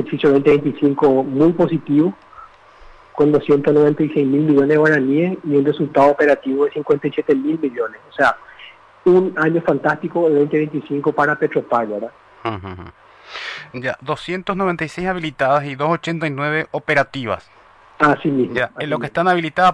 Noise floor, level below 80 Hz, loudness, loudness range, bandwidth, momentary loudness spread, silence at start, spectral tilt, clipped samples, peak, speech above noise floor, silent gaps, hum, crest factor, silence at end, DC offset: -44 dBFS; -52 dBFS; -17 LUFS; 7 LU; 10 kHz; 12 LU; 0 s; -7.5 dB/octave; under 0.1%; -4 dBFS; 27 dB; none; none; 14 dB; 0 s; under 0.1%